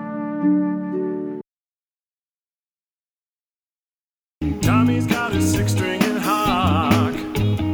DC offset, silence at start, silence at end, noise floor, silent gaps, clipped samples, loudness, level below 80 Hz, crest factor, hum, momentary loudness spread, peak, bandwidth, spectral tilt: under 0.1%; 0 s; 0 s; under -90 dBFS; 1.50-1.95 s, 2.02-2.12 s, 2.21-2.45 s, 2.53-3.08 s, 3.16-3.44 s, 3.50-3.86 s, 3.93-4.10 s, 4.19-4.35 s; under 0.1%; -20 LUFS; -40 dBFS; 18 dB; none; 10 LU; -4 dBFS; over 20 kHz; -6 dB/octave